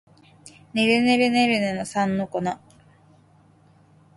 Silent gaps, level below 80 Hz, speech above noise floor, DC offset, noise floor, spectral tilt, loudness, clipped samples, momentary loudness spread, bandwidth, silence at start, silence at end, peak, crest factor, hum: none; -62 dBFS; 34 dB; under 0.1%; -56 dBFS; -5 dB/octave; -22 LUFS; under 0.1%; 12 LU; 11.5 kHz; 0.45 s; 1.6 s; -6 dBFS; 18 dB; none